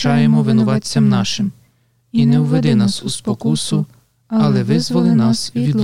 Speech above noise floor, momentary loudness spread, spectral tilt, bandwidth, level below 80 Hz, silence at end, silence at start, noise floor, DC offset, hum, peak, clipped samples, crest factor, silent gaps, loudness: 43 dB; 8 LU; -6 dB/octave; 12 kHz; -54 dBFS; 0 s; 0 s; -57 dBFS; 1%; none; -2 dBFS; under 0.1%; 12 dB; none; -16 LUFS